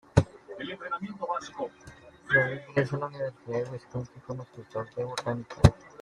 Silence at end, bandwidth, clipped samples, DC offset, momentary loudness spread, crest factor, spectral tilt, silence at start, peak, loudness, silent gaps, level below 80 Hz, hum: 0 s; 12 kHz; under 0.1%; under 0.1%; 16 LU; 28 dB; -6.5 dB/octave; 0.15 s; -2 dBFS; -30 LUFS; none; -44 dBFS; none